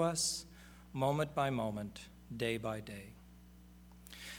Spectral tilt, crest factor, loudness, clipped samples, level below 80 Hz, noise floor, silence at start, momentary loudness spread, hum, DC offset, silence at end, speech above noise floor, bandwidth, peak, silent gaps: -4 dB/octave; 20 dB; -37 LUFS; under 0.1%; -60 dBFS; -58 dBFS; 0 s; 23 LU; 60 Hz at -60 dBFS; under 0.1%; 0 s; 21 dB; over 20 kHz; -20 dBFS; none